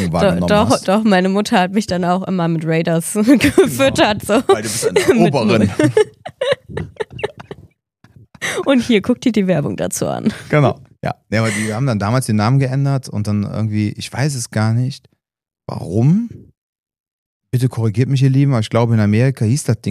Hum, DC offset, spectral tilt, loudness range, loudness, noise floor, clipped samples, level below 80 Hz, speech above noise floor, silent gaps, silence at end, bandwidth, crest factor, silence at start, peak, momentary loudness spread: none; under 0.1%; -6 dB/octave; 6 LU; -16 LUFS; -53 dBFS; under 0.1%; -46 dBFS; 38 dB; 16.57-16.83 s, 17.00-17.04 s, 17.11-17.41 s; 0 s; 15.5 kHz; 16 dB; 0 s; 0 dBFS; 10 LU